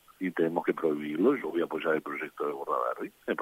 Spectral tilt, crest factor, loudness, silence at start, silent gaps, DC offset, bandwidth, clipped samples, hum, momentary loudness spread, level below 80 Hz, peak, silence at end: -7 dB/octave; 18 dB; -30 LUFS; 0.2 s; none; under 0.1%; 16 kHz; under 0.1%; none; 8 LU; -76 dBFS; -12 dBFS; 0 s